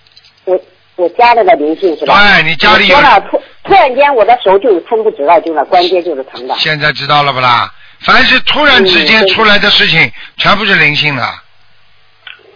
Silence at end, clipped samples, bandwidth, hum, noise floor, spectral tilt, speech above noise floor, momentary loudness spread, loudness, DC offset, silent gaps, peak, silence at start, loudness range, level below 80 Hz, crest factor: 1.15 s; 1%; 5.4 kHz; none; -49 dBFS; -5 dB/octave; 41 dB; 11 LU; -7 LUFS; under 0.1%; none; 0 dBFS; 0.45 s; 4 LU; -38 dBFS; 8 dB